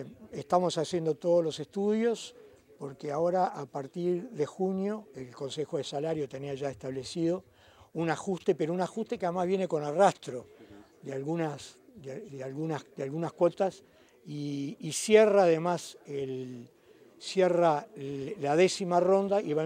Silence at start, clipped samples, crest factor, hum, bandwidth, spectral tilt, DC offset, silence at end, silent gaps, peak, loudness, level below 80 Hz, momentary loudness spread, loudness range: 0 s; under 0.1%; 22 dB; none; 15.5 kHz; -5.5 dB/octave; under 0.1%; 0 s; none; -8 dBFS; -30 LUFS; -74 dBFS; 17 LU; 7 LU